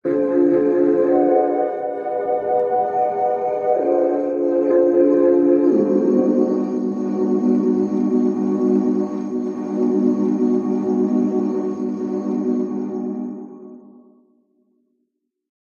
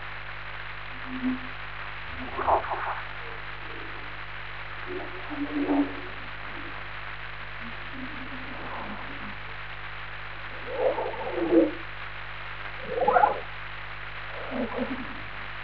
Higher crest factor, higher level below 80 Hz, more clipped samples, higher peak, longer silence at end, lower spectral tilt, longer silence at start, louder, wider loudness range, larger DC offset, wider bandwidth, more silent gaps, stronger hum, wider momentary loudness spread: second, 14 dB vs 26 dB; second, -70 dBFS vs -48 dBFS; neither; about the same, -4 dBFS vs -6 dBFS; first, 1.9 s vs 0 s; first, -9.5 dB/octave vs -3.5 dB/octave; about the same, 0.05 s vs 0 s; first, -19 LUFS vs -31 LUFS; about the same, 8 LU vs 9 LU; second, under 0.1% vs 1%; first, 7 kHz vs 5.4 kHz; neither; second, none vs 50 Hz at -45 dBFS; second, 9 LU vs 12 LU